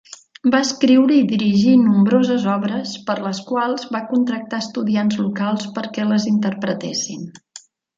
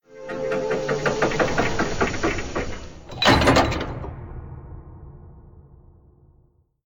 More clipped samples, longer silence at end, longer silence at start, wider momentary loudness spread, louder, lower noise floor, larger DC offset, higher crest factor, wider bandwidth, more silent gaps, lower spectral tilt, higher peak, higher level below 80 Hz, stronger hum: neither; second, 0.4 s vs 1.25 s; about the same, 0.1 s vs 0.1 s; second, 11 LU vs 23 LU; first, -18 LUFS vs -22 LUFS; second, -45 dBFS vs -60 dBFS; neither; second, 14 dB vs 20 dB; second, 7.8 kHz vs 19 kHz; neither; about the same, -5.5 dB/octave vs -4.5 dB/octave; about the same, -4 dBFS vs -4 dBFS; second, -64 dBFS vs -36 dBFS; neither